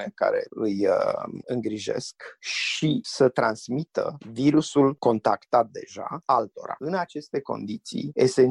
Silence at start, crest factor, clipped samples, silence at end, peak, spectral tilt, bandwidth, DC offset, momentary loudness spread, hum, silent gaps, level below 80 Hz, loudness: 0 s; 18 dB; under 0.1%; 0 s; -6 dBFS; -5.5 dB/octave; 11 kHz; under 0.1%; 11 LU; none; none; -66 dBFS; -25 LUFS